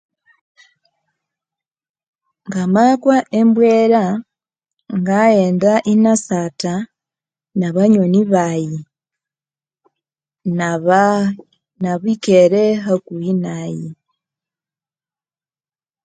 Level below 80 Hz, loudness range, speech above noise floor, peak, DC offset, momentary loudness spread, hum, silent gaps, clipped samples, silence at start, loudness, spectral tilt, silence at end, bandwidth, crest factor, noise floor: -62 dBFS; 5 LU; over 76 dB; 0 dBFS; under 0.1%; 14 LU; none; none; under 0.1%; 2.45 s; -15 LUFS; -6.5 dB/octave; 2.1 s; 9.2 kHz; 16 dB; under -90 dBFS